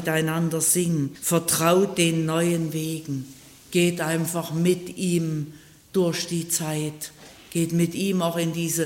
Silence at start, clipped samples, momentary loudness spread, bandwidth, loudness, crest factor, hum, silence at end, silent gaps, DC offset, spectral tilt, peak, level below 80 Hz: 0 s; under 0.1%; 11 LU; 16.5 kHz; -24 LUFS; 18 dB; none; 0 s; none; under 0.1%; -4.5 dB/octave; -6 dBFS; -62 dBFS